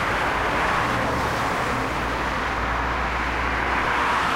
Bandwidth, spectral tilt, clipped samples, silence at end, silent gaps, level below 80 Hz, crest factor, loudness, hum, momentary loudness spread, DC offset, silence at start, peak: 16 kHz; -4.5 dB/octave; under 0.1%; 0 s; none; -34 dBFS; 14 dB; -23 LUFS; none; 3 LU; 0.2%; 0 s; -10 dBFS